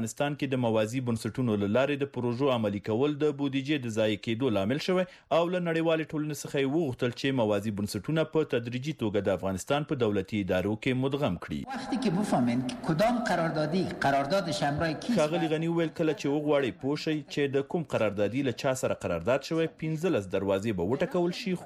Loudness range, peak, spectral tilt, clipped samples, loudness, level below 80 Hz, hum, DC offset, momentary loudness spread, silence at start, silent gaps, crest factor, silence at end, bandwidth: 2 LU; -16 dBFS; -6 dB/octave; under 0.1%; -29 LUFS; -60 dBFS; none; under 0.1%; 4 LU; 0 s; none; 12 dB; 0 s; 15 kHz